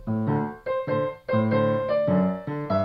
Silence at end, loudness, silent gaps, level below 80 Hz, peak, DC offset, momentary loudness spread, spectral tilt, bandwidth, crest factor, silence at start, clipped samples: 0 s; -25 LUFS; none; -54 dBFS; -12 dBFS; under 0.1%; 6 LU; -10 dB/octave; 5.4 kHz; 14 dB; 0 s; under 0.1%